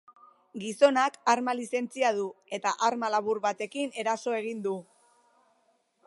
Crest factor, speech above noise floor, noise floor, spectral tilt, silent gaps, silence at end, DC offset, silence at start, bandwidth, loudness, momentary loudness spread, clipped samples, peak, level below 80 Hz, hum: 22 dB; 42 dB; -70 dBFS; -3.5 dB/octave; none; 1.25 s; under 0.1%; 0.55 s; 11.5 kHz; -29 LUFS; 11 LU; under 0.1%; -8 dBFS; -84 dBFS; none